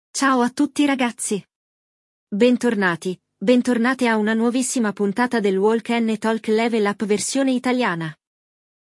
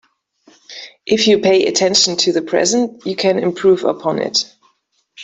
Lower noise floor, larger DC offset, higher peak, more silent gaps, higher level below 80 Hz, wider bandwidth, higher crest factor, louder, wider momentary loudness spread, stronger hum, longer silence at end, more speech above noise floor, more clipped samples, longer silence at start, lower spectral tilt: first, under -90 dBFS vs -63 dBFS; neither; second, -4 dBFS vs 0 dBFS; first, 1.56-2.27 s vs none; second, -72 dBFS vs -60 dBFS; first, 12 kHz vs 8.4 kHz; about the same, 16 dB vs 16 dB; second, -20 LUFS vs -15 LUFS; second, 7 LU vs 17 LU; neither; first, 0.85 s vs 0 s; first, over 71 dB vs 48 dB; neither; second, 0.15 s vs 0.7 s; first, -4.5 dB/octave vs -3 dB/octave